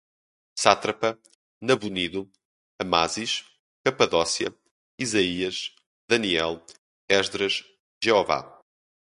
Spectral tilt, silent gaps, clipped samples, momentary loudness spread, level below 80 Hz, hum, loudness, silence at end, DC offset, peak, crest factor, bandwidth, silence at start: -3 dB/octave; 1.35-1.61 s, 2.45-2.79 s, 3.59-3.84 s, 4.71-4.98 s, 5.86-6.08 s, 6.78-7.08 s, 7.80-8.01 s; under 0.1%; 12 LU; -58 dBFS; none; -25 LUFS; 0.7 s; under 0.1%; 0 dBFS; 26 dB; 11.5 kHz; 0.55 s